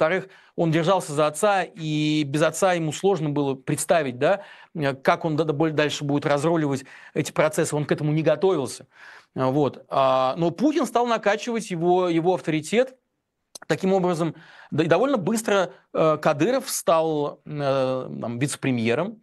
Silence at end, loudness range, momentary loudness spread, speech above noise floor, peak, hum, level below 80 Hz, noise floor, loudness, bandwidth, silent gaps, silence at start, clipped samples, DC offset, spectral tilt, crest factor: 0.05 s; 2 LU; 7 LU; 54 dB; -2 dBFS; none; -68 dBFS; -77 dBFS; -23 LUFS; 12.5 kHz; none; 0 s; under 0.1%; under 0.1%; -5.5 dB/octave; 20 dB